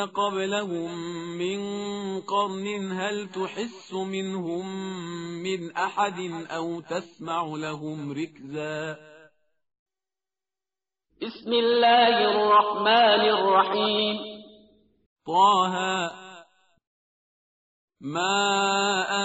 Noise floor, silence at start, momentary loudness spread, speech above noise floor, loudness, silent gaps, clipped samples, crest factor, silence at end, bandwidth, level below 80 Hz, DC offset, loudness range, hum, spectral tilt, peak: under -90 dBFS; 0 s; 15 LU; over 65 dB; -25 LUFS; 9.79-9.86 s, 15.06-15.16 s, 16.87-17.88 s; under 0.1%; 18 dB; 0 s; 8 kHz; -72 dBFS; under 0.1%; 13 LU; none; -2 dB/octave; -8 dBFS